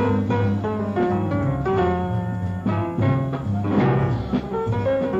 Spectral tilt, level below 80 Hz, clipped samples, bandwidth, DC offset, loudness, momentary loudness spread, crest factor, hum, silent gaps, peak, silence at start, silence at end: -9.5 dB/octave; -42 dBFS; under 0.1%; 7.6 kHz; under 0.1%; -22 LUFS; 5 LU; 14 dB; none; none; -8 dBFS; 0 s; 0 s